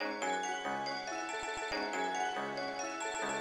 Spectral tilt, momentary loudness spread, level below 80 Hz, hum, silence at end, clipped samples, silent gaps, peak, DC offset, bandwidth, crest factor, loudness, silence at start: -2 dB/octave; 3 LU; -68 dBFS; none; 0 s; under 0.1%; none; -24 dBFS; under 0.1%; 15.5 kHz; 14 dB; -37 LUFS; 0 s